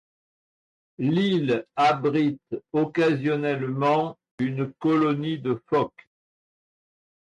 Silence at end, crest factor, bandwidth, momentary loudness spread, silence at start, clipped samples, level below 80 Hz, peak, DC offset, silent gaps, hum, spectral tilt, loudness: 1.35 s; 14 dB; 9.6 kHz; 7 LU; 1 s; under 0.1%; -68 dBFS; -12 dBFS; under 0.1%; 4.31-4.38 s; none; -7.5 dB/octave; -24 LUFS